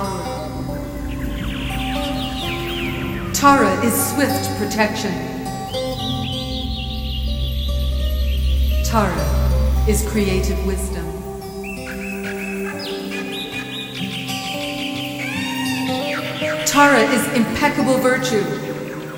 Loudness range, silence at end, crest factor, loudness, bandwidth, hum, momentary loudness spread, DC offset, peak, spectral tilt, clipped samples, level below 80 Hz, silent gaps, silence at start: 8 LU; 0 s; 20 dB; -20 LUFS; 17 kHz; none; 11 LU; under 0.1%; 0 dBFS; -4.5 dB/octave; under 0.1%; -26 dBFS; none; 0 s